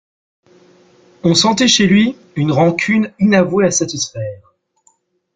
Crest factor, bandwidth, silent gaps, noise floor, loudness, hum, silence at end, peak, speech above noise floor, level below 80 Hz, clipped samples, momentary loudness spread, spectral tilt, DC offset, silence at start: 16 dB; 9.4 kHz; none; -58 dBFS; -14 LUFS; none; 1 s; 0 dBFS; 45 dB; -52 dBFS; under 0.1%; 10 LU; -4 dB/octave; under 0.1%; 1.25 s